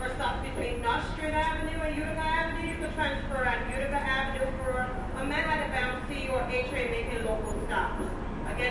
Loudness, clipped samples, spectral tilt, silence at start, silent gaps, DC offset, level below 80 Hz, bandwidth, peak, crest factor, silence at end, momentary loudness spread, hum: -31 LUFS; under 0.1%; -5 dB/octave; 0 s; none; under 0.1%; -38 dBFS; 11.5 kHz; -16 dBFS; 16 dB; 0 s; 5 LU; none